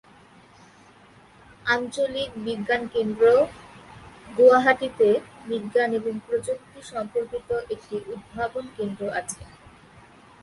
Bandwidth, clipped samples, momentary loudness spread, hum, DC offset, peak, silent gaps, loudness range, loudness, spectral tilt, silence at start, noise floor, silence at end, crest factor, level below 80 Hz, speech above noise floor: 11.5 kHz; under 0.1%; 15 LU; none; under 0.1%; -4 dBFS; none; 10 LU; -24 LUFS; -4.5 dB/octave; 1.65 s; -52 dBFS; 0.95 s; 20 dB; -58 dBFS; 29 dB